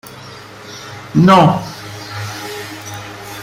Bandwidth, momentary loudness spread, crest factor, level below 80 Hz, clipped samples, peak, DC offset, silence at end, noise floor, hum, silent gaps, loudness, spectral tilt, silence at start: 16 kHz; 24 LU; 16 dB; -50 dBFS; under 0.1%; 0 dBFS; under 0.1%; 0 s; -34 dBFS; none; none; -14 LUFS; -6 dB/octave; 0.1 s